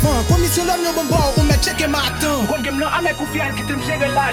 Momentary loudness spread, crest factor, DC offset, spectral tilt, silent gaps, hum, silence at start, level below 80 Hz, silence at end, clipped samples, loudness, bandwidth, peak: 5 LU; 14 dB; under 0.1%; -4.5 dB/octave; none; none; 0 s; -26 dBFS; 0 s; under 0.1%; -18 LUFS; 19 kHz; -2 dBFS